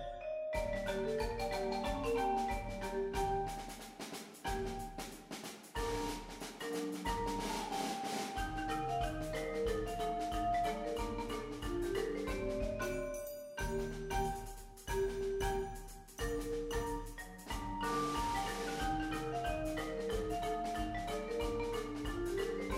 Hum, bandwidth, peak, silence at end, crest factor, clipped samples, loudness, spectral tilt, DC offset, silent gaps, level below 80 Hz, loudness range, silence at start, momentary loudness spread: none; 16 kHz; -24 dBFS; 0 s; 14 dB; under 0.1%; -39 LUFS; -4.5 dB/octave; under 0.1%; none; -48 dBFS; 3 LU; 0 s; 8 LU